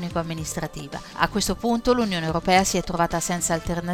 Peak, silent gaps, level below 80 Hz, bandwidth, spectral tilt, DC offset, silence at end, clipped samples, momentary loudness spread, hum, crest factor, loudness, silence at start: -4 dBFS; none; -40 dBFS; 18 kHz; -4 dB/octave; under 0.1%; 0 s; under 0.1%; 11 LU; none; 20 dB; -23 LUFS; 0 s